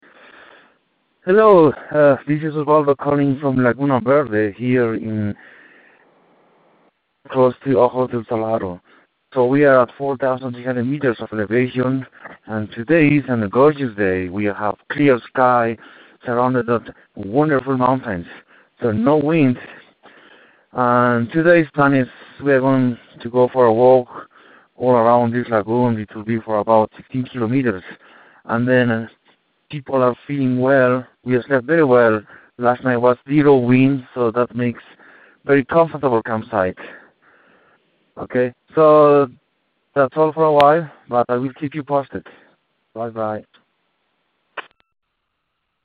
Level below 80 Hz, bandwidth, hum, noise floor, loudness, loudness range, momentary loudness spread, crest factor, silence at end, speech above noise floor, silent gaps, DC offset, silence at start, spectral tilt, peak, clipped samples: -58 dBFS; 4.8 kHz; none; -73 dBFS; -17 LUFS; 6 LU; 14 LU; 18 dB; 1.25 s; 57 dB; none; under 0.1%; 1.25 s; -10 dB/octave; 0 dBFS; under 0.1%